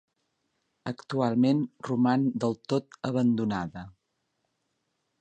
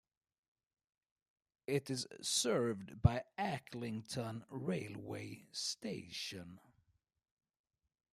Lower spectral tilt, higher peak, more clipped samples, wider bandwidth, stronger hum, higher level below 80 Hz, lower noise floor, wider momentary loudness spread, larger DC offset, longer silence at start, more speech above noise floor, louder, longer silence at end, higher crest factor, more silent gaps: first, -7.5 dB/octave vs -4.5 dB/octave; about the same, -12 dBFS vs -14 dBFS; neither; second, 8.6 kHz vs 15.5 kHz; neither; about the same, -64 dBFS vs -60 dBFS; about the same, -78 dBFS vs -78 dBFS; about the same, 14 LU vs 12 LU; neither; second, 0.85 s vs 1.7 s; first, 51 dB vs 38 dB; first, -27 LUFS vs -40 LUFS; second, 1.3 s vs 1.55 s; second, 18 dB vs 28 dB; neither